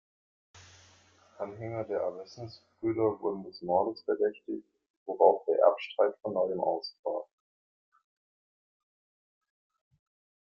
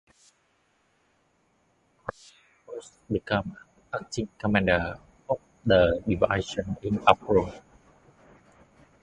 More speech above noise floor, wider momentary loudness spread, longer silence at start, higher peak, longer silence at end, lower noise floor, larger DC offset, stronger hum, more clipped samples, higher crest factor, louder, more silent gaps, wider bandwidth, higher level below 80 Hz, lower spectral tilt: second, 32 dB vs 43 dB; about the same, 17 LU vs 19 LU; second, 0.55 s vs 2.05 s; second, -8 dBFS vs 0 dBFS; first, 3.3 s vs 1.45 s; second, -62 dBFS vs -69 dBFS; neither; neither; neither; about the same, 26 dB vs 28 dB; second, -31 LUFS vs -26 LUFS; first, 4.90-5.06 s, 6.99-7.03 s vs none; second, 7.2 kHz vs 10.5 kHz; second, -76 dBFS vs -48 dBFS; about the same, -7 dB/octave vs -6 dB/octave